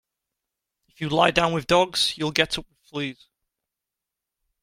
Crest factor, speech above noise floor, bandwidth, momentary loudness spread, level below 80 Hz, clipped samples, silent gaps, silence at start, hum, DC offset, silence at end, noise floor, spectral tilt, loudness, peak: 26 dB; 63 dB; 16.5 kHz; 13 LU; -52 dBFS; under 0.1%; none; 1 s; none; under 0.1%; 1.5 s; -86 dBFS; -4 dB/octave; -22 LUFS; -2 dBFS